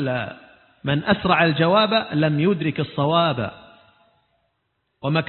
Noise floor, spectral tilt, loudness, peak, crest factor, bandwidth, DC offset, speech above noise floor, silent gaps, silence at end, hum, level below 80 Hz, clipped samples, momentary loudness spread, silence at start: -73 dBFS; -11 dB/octave; -20 LUFS; -4 dBFS; 18 dB; 4.4 kHz; under 0.1%; 53 dB; none; 0 s; none; -54 dBFS; under 0.1%; 13 LU; 0 s